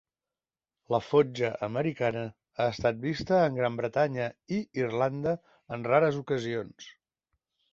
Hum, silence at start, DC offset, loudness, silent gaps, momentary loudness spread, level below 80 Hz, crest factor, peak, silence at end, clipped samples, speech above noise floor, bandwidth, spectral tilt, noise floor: none; 0.9 s; under 0.1%; -29 LUFS; none; 12 LU; -62 dBFS; 20 dB; -10 dBFS; 0.8 s; under 0.1%; over 62 dB; 7.6 kHz; -7 dB/octave; under -90 dBFS